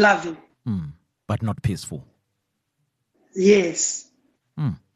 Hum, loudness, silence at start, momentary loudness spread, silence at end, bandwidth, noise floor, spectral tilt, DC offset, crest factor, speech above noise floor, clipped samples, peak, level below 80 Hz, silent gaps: none; -23 LUFS; 0 s; 19 LU; 0.2 s; 13 kHz; -76 dBFS; -4.5 dB/octave; under 0.1%; 20 dB; 55 dB; under 0.1%; -4 dBFS; -52 dBFS; none